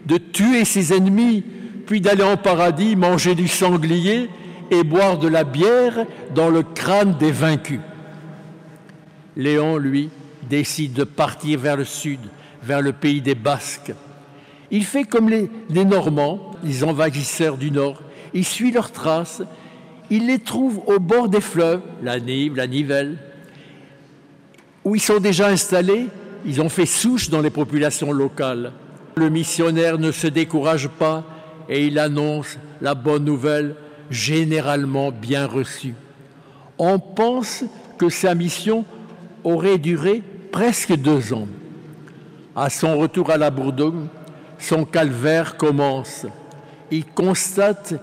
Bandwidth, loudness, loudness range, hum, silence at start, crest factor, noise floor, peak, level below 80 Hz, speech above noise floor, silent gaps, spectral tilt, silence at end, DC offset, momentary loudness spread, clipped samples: 16 kHz; -19 LUFS; 5 LU; none; 0.05 s; 14 dB; -49 dBFS; -6 dBFS; -58 dBFS; 31 dB; none; -5 dB/octave; 0 s; under 0.1%; 14 LU; under 0.1%